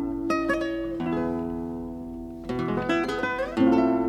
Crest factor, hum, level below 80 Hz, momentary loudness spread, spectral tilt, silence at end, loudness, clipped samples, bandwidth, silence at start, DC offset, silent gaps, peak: 16 dB; none; -48 dBFS; 14 LU; -6.5 dB/octave; 0 s; -27 LUFS; under 0.1%; 12 kHz; 0 s; under 0.1%; none; -10 dBFS